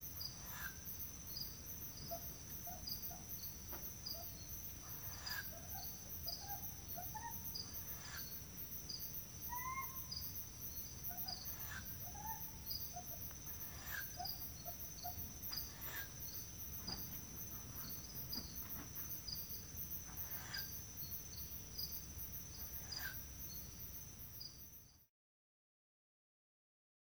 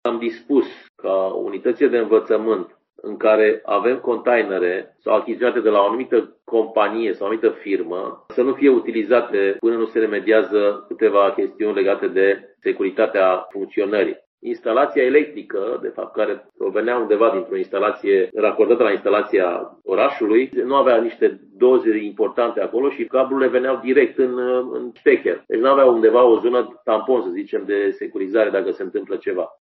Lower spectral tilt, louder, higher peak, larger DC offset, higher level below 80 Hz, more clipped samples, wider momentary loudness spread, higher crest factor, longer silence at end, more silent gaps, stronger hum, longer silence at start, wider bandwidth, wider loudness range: second, -2 dB/octave vs -8 dB/octave; second, -46 LUFS vs -19 LUFS; second, -28 dBFS vs -2 dBFS; neither; first, -60 dBFS vs -72 dBFS; neither; second, 3 LU vs 9 LU; about the same, 20 dB vs 16 dB; first, 1.95 s vs 0.15 s; second, none vs 0.89-0.94 s, 14.26-14.38 s; neither; about the same, 0 s vs 0.05 s; first, over 20 kHz vs 4.7 kHz; about the same, 2 LU vs 3 LU